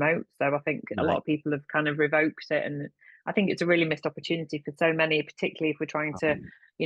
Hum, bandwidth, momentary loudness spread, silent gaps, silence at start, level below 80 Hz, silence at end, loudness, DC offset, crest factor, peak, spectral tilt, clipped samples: none; 9.4 kHz; 8 LU; none; 0 s; -64 dBFS; 0 s; -27 LUFS; under 0.1%; 18 dB; -10 dBFS; -6.5 dB/octave; under 0.1%